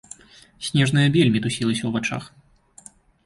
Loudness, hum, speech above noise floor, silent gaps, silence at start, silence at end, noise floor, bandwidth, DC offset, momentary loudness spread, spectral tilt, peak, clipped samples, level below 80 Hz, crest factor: -21 LUFS; none; 29 dB; none; 0.6 s; 1 s; -49 dBFS; 11.5 kHz; under 0.1%; 16 LU; -5.5 dB/octave; -6 dBFS; under 0.1%; -54 dBFS; 16 dB